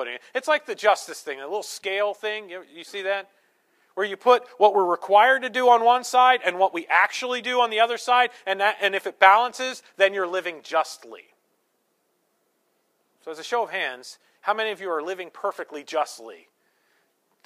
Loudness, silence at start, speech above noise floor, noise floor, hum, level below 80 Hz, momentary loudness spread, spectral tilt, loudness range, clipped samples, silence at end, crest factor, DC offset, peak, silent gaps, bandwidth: -22 LUFS; 0 s; 48 dB; -71 dBFS; none; -86 dBFS; 16 LU; -1.5 dB/octave; 12 LU; under 0.1%; 1.1 s; 22 dB; under 0.1%; -2 dBFS; none; 15 kHz